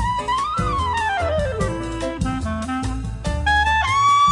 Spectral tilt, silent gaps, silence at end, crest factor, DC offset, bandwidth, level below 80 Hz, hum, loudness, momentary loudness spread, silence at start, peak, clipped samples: -4.5 dB/octave; none; 0 s; 12 dB; under 0.1%; 11.5 kHz; -30 dBFS; none; -21 LUFS; 10 LU; 0 s; -8 dBFS; under 0.1%